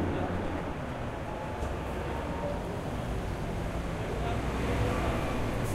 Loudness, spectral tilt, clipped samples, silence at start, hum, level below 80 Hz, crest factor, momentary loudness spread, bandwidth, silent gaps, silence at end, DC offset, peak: -34 LUFS; -6.5 dB/octave; under 0.1%; 0 s; none; -38 dBFS; 16 dB; 6 LU; 16 kHz; none; 0 s; under 0.1%; -18 dBFS